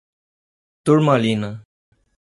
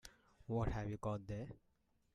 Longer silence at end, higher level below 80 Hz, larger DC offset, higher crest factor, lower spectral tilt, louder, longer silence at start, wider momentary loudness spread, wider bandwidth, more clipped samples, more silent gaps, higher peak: first, 0.75 s vs 0.55 s; about the same, -60 dBFS vs -56 dBFS; neither; about the same, 18 dB vs 18 dB; about the same, -7 dB/octave vs -7.5 dB/octave; first, -18 LUFS vs -44 LUFS; first, 0.85 s vs 0.05 s; second, 16 LU vs 20 LU; about the same, 11.5 kHz vs 11.5 kHz; neither; neither; first, -2 dBFS vs -26 dBFS